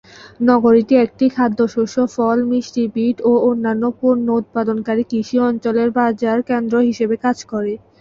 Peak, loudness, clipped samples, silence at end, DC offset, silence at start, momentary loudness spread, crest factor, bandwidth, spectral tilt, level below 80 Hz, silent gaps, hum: -2 dBFS; -17 LUFS; under 0.1%; 0.25 s; under 0.1%; 0.2 s; 6 LU; 14 dB; 7.4 kHz; -6.5 dB/octave; -56 dBFS; none; none